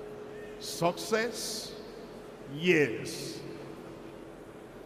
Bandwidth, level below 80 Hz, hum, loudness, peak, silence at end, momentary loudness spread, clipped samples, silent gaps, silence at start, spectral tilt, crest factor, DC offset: 15.5 kHz; -64 dBFS; none; -32 LUFS; -12 dBFS; 0 s; 20 LU; under 0.1%; none; 0 s; -4 dB/octave; 22 dB; under 0.1%